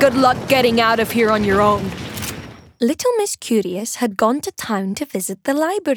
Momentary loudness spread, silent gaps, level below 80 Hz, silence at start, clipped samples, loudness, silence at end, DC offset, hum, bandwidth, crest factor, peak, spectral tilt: 11 LU; none; -48 dBFS; 0 s; under 0.1%; -18 LUFS; 0 s; under 0.1%; none; over 20 kHz; 16 dB; -2 dBFS; -4 dB/octave